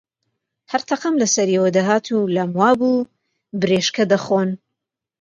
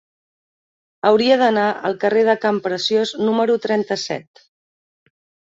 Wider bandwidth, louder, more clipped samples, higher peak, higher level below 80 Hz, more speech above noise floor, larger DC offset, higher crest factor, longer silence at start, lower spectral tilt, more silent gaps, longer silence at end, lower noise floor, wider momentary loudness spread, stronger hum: first, 9 kHz vs 7.8 kHz; about the same, -18 LUFS vs -18 LUFS; neither; about the same, -2 dBFS vs -2 dBFS; about the same, -64 dBFS vs -66 dBFS; second, 64 dB vs over 73 dB; neither; about the same, 18 dB vs 18 dB; second, 0.7 s vs 1.05 s; about the same, -4.5 dB/octave vs -4.5 dB/octave; neither; second, 0.65 s vs 1.35 s; second, -82 dBFS vs under -90 dBFS; about the same, 9 LU vs 8 LU; neither